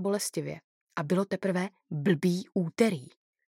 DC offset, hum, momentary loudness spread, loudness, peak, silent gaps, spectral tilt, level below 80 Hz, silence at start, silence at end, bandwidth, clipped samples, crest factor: under 0.1%; none; 13 LU; -30 LUFS; -10 dBFS; 0.64-0.87 s; -6 dB/octave; -78 dBFS; 0 s; 0.45 s; 16.5 kHz; under 0.1%; 20 dB